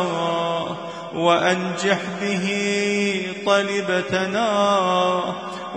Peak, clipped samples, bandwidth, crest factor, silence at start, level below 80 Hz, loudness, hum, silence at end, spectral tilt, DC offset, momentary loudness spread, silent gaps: -4 dBFS; under 0.1%; 10.5 kHz; 18 dB; 0 s; -64 dBFS; -21 LUFS; none; 0 s; -4.5 dB/octave; under 0.1%; 7 LU; none